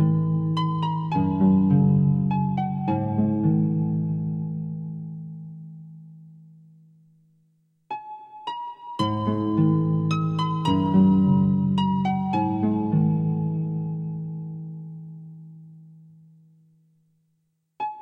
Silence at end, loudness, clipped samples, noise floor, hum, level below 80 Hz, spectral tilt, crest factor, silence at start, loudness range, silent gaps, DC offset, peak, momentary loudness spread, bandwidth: 0 s; -23 LUFS; under 0.1%; -72 dBFS; none; -56 dBFS; -9 dB/octave; 16 dB; 0 s; 19 LU; none; under 0.1%; -8 dBFS; 19 LU; 6.8 kHz